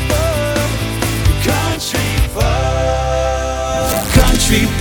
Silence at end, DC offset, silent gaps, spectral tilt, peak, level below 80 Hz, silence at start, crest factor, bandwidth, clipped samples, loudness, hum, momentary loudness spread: 0 s; under 0.1%; none; -4.5 dB/octave; 0 dBFS; -20 dBFS; 0 s; 14 dB; 19.5 kHz; under 0.1%; -15 LUFS; none; 5 LU